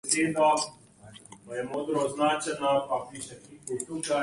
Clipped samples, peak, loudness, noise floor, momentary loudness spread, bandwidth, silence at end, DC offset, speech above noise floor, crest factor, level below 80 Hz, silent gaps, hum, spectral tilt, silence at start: under 0.1%; -8 dBFS; -28 LUFS; -51 dBFS; 17 LU; 11.5 kHz; 0 s; under 0.1%; 23 dB; 20 dB; -68 dBFS; none; none; -3 dB/octave; 0.05 s